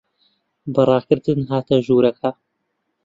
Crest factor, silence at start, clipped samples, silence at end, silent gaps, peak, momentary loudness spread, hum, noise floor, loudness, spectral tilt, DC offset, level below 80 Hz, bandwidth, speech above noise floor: 18 dB; 0.65 s; under 0.1%; 0.75 s; none; -2 dBFS; 10 LU; none; -73 dBFS; -18 LUFS; -8.5 dB/octave; under 0.1%; -58 dBFS; 7.6 kHz; 56 dB